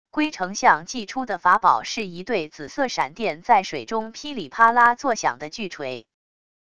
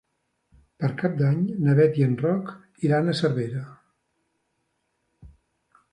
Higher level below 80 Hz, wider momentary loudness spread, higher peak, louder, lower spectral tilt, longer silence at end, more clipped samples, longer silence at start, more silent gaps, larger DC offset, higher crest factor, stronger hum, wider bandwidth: about the same, -60 dBFS vs -62 dBFS; about the same, 14 LU vs 12 LU; first, -2 dBFS vs -8 dBFS; about the same, -22 LUFS vs -24 LUFS; second, -3 dB/octave vs -8.5 dB/octave; about the same, 0.75 s vs 0.65 s; neither; second, 0.15 s vs 0.8 s; neither; first, 0.4% vs under 0.1%; about the same, 22 dB vs 18 dB; neither; about the same, 11 kHz vs 10.5 kHz